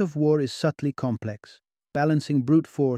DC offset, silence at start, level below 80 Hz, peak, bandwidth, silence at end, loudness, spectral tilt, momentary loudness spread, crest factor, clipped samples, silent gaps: under 0.1%; 0 s; -64 dBFS; -10 dBFS; 10.5 kHz; 0 s; -24 LUFS; -7.5 dB/octave; 11 LU; 16 dB; under 0.1%; none